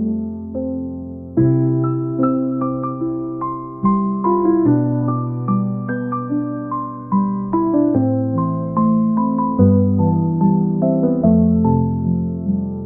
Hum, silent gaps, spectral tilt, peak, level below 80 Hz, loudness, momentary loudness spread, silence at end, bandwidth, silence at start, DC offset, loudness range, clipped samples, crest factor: none; none; -15 dB/octave; -2 dBFS; -48 dBFS; -18 LUFS; 9 LU; 0 s; 2.5 kHz; 0 s; 0.2%; 4 LU; under 0.1%; 16 dB